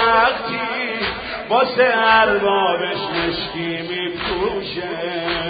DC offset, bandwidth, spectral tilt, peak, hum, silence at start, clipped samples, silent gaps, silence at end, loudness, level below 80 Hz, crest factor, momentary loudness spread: under 0.1%; 5 kHz; -9.5 dB/octave; 0 dBFS; none; 0 s; under 0.1%; none; 0 s; -19 LUFS; -46 dBFS; 18 dB; 11 LU